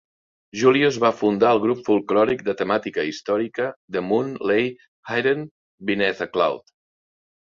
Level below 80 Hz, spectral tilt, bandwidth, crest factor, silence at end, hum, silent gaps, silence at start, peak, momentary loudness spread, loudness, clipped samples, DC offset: -62 dBFS; -5.5 dB/octave; 7.4 kHz; 20 dB; 0.9 s; none; 3.76-3.88 s, 4.88-5.03 s, 5.51-5.78 s; 0.55 s; -2 dBFS; 10 LU; -21 LUFS; under 0.1%; under 0.1%